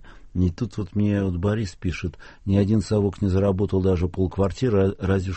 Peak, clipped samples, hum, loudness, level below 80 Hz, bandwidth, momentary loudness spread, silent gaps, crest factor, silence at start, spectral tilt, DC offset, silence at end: -8 dBFS; under 0.1%; none; -23 LUFS; -40 dBFS; 8.4 kHz; 8 LU; none; 16 dB; 0.05 s; -8 dB/octave; under 0.1%; 0 s